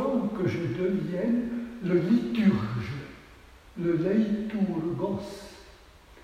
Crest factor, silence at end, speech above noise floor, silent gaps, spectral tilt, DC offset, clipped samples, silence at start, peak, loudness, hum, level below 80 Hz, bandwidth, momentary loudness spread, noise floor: 18 dB; 0 s; 26 dB; none; -8 dB/octave; under 0.1%; under 0.1%; 0 s; -10 dBFS; -28 LUFS; none; -54 dBFS; 10 kHz; 15 LU; -52 dBFS